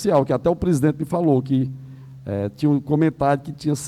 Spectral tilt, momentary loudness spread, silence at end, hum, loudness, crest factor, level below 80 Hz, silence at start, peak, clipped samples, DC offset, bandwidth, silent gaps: -7.5 dB/octave; 10 LU; 0 s; none; -21 LUFS; 14 dB; -48 dBFS; 0 s; -6 dBFS; under 0.1%; under 0.1%; 13.5 kHz; none